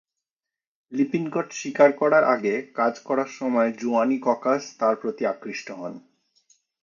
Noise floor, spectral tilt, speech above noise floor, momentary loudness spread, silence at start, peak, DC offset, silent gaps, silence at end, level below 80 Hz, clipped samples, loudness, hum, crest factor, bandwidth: -90 dBFS; -5.5 dB/octave; 67 dB; 14 LU; 0.9 s; -4 dBFS; under 0.1%; none; 0.85 s; -78 dBFS; under 0.1%; -23 LUFS; none; 20 dB; 7.4 kHz